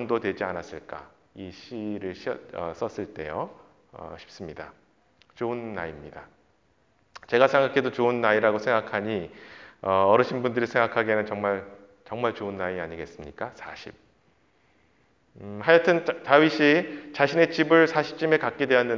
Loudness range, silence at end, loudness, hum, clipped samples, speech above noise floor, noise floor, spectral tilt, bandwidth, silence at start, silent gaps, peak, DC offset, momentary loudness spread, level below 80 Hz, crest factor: 15 LU; 0 s; -24 LUFS; none; under 0.1%; 41 dB; -66 dBFS; -6 dB/octave; 7.4 kHz; 0 s; none; -2 dBFS; under 0.1%; 22 LU; -60 dBFS; 24 dB